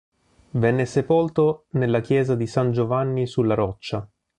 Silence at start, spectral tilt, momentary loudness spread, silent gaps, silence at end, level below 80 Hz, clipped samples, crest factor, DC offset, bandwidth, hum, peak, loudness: 0.55 s; -8 dB/octave; 7 LU; none; 0.35 s; -52 dBFS; under 0.1%; 16 dB; under 0.1%; 10 kHz; none; -6 dBFS; -22 LUFS